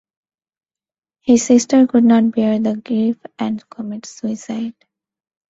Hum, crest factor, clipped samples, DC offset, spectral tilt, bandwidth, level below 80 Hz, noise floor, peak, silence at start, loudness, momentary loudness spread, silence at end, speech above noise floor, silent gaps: none; 16 dB; under 0.1%; under 0.1%; -5.5 dB/octave; 8 kHz; -60 dBFS; under -90 dBFS; -2 dBFS; 1.25 s; -16 LUFS; 15 LU; 0.8 s; over 74 dB; none